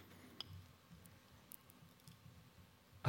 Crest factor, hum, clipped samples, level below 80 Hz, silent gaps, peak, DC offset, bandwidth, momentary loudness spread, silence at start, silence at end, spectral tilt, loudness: 26 dB; none; under 0.1%; -78 dBFS; none; -26 dBFS; under 0.1%; 16.5 kHz; 12 LU; 0 s; 0 s; -4.5 dB/octave; -59 LUFS